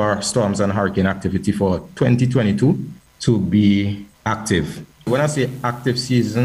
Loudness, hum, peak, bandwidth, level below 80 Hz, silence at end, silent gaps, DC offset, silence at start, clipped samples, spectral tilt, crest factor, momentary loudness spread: -19 LUFS; none; -4 dBFS; 15 kHz; -46 dBFS; 0 s; none; under 0.1%; 0 s; under 0.1%; -6 dB/octave; 14 dB; 8 LU